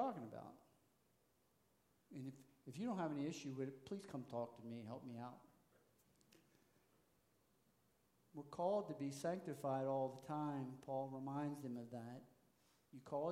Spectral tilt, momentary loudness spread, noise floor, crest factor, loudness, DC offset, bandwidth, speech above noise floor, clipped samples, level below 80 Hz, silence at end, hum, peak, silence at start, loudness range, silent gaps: -7 dB/octave; 15 LU; -80 dBFS; 20 dB; -47 LUFS; under 0.1%; 16 kHz; 33 dB; under 0.1%; -88 dBFS; 0 s; none; -30 dBFS; 0 s; 13 LU; none